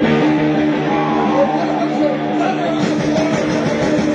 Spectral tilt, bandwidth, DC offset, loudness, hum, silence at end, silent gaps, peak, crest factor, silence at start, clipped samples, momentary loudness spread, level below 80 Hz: -6.5 dB/octave; 9 kHz; under 0.1%; -16 LUFS; none; 0 s; none; -4 dBFS; 12 dB; 0 s; under 0.1%; 3 LU; -46 dBFS